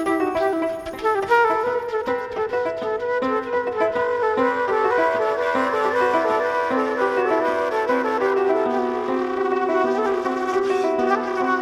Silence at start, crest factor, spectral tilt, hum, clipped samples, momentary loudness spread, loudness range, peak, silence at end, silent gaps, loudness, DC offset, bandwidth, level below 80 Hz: 0 s; 14 dB; -5 dB/octave; none; under 0.1%; 5 LU; 2 LU; -6 dBFS; 0 s; none; -21 LUFS; under 0.1%; 13 kHz; -56 dBFS